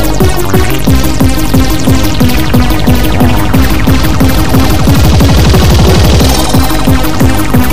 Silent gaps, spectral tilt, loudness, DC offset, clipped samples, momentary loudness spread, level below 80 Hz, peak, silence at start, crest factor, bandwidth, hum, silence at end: none; -5.5 dB/octave; -8 LUFS; 30%; 2%; 4 LU; -12 dBFS; 0 dBFS; 0 s; 8 dB; 16 kHz; none; 0 s